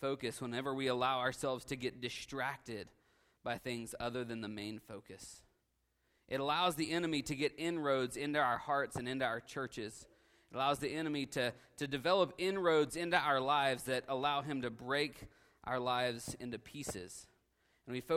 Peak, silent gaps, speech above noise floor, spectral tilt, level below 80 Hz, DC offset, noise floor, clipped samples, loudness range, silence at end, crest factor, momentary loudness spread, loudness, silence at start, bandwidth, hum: -16 dBFS; none; 43 dB; -4 dB/octave; -68 dBFS; under 0.1%; -80 dBFS; under 0.1%; 9 LU; 0 s; 22 dB; 15 LU; -37 LUFS; 0 s; 16 kHz; none